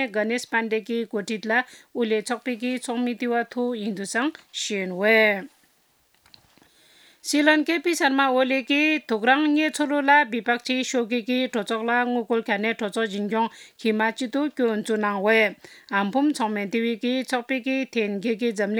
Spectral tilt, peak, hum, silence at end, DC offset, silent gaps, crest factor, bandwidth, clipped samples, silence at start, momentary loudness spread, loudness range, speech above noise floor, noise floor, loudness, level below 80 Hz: -4 dB/octave; -4 dBFS; none; 0 s; under 0.1%; none; 20 dB; 18 kHz; under 0.1%; 0 s; 9 LU; 5 LU; 40 dB; -64 dBFS; -23 LUFS; -80 dBFS